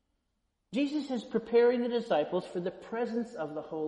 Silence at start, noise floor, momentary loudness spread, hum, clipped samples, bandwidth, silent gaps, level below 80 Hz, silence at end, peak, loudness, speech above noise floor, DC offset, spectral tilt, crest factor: 0.7 s; -79 dBFS; 12 LU; none; under 0.1%; 9.8 kHz; none; -72 dBFS; 0 s; -14 dBFS; -31 LUFS; 49 dB; under 0.1%; -6.5 dB/octave; 16 dB